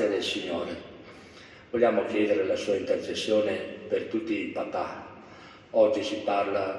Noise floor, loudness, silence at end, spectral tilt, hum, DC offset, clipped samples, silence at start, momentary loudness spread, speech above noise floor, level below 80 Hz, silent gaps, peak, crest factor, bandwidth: -49 dBFS; -28 LUFS; 0 s; -4.5 dB/octave; none; under 0.1%; under 0.1%; 0 s; 23 LU; 22 dB; -68 dBFS; none; -10 dBFS; 18 dB; 11.5 kHz